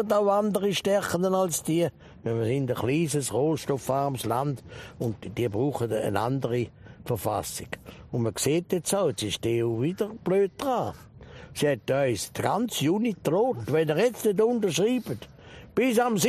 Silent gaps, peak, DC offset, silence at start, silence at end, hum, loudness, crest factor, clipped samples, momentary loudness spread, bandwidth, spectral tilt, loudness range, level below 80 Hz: none; -8 dBFS; under 0.1%; 0 s; 0 s; none; -27 LUFS; 18 dB; under 0.1%; 10 LU; 15 kHz; -5 dB/octave; 4 LU; -58 dBFS